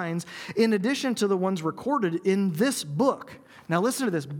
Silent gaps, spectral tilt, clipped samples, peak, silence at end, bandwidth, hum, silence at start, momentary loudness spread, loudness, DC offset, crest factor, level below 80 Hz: none; -5.5 dB/octave; under 0.1%; -8 dBFS; 0 s; 18.5 kHz; none; 0 s; 8 LU; -26 LUFS; under 0.1%; 18 dB; -72 dBFS